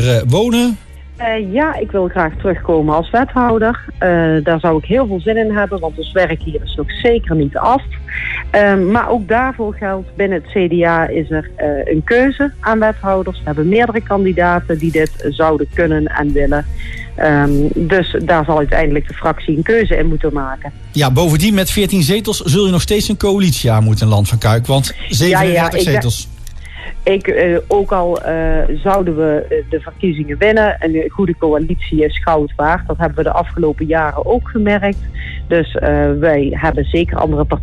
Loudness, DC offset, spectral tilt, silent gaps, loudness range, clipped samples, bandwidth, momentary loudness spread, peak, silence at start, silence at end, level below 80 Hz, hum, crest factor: -14 LUFS; under 0.1%; -6 dB/octave; none; 2 LU; under 0.1%; 13.5 kHz; 7 LU; -2 dBFS; 0 s; 0 s; -24 dBFS; none; 12 dB